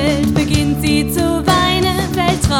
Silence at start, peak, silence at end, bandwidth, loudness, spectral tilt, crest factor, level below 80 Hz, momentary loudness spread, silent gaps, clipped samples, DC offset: 0 s; 0 dBFS; 0 s; 19 kHz; -15 LUFS; -5 dB/octave; 14 dB; -28 dBFS; 3 LU; none; under 0.1%; under 0.1%